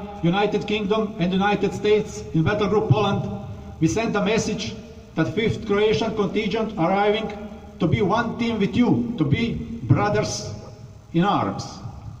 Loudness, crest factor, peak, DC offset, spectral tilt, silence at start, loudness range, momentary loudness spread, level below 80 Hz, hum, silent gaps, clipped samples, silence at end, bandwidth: -22 LUFS; 18 dB; -4 dBFS; under 0.1%; -6 dB/octave; 0 s; 1 LU; 12 LU; -44 dBFS; none; none; under 0.1%; 0 s; 10 kHz